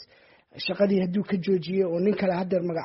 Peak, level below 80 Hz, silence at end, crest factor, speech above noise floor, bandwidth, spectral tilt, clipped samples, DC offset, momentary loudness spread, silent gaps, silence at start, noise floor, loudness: -10 dBFS; -64 dBFS; 0 s; 16 dB; 33 dB; 5.8 kHz; -6 dB/octave; under 0.1%; under 0.1%; 4 LU; none; 0 s; -58 dBFS; -25 LUFS